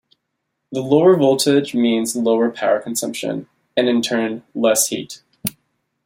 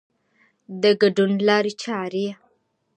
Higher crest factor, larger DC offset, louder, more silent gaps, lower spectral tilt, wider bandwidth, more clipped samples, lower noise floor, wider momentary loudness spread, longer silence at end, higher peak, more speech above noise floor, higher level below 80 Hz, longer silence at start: about the same, 18 dB vs 18 dB; neither; first, -18 LUFS vs -21 LUFS; neither; second, -4 dB/octave vs -5.5 dB/octave; first, 16.5 kHz vs 9 kHz; neither; first, -75 dBFS vs -67 dBFS; first, 14 LU vs 11 LU; about the same, 0.55 s vs 0.65 s; first, 0 dBFS vs -4 dBFS; first, 58 dB vs 47 dB; first, -64 dBFS vs -72 dBFS; about the same, 0.7 s vs 0.7 s